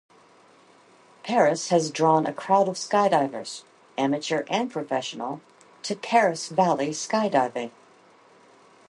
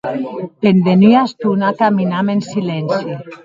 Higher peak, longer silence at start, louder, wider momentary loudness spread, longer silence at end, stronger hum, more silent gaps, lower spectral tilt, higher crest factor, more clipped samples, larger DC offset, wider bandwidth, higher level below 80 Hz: second, -6 dBFS vs 0 dBFS; first, 1.25 s vs 0.05 s; second, -24 LUFS vs -14 LUFS; first, 15 LU vs 12 LU; first, 1.2 s vs 0.1 s; neither; neither; second, -4.5 dB/octave vs -8 dB/octave; first, 20 dB vs 14 dB; neither; neither; first, 11.5 kHz vs 7.6 kHz; second, -76 dBFS vs -58 dBFS